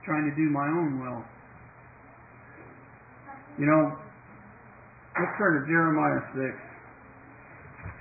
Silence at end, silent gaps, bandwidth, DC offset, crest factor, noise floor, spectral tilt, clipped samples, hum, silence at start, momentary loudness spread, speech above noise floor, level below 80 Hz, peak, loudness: 0 s; none; 2.7 kHz; under 0.1%; 20 dB; -51 dBFS; -14 dB/octave; under 0.1%; none; 0.05 s; 26 LU; 25 dB; -62 dBFS; -10 dBFS; -27 LUFS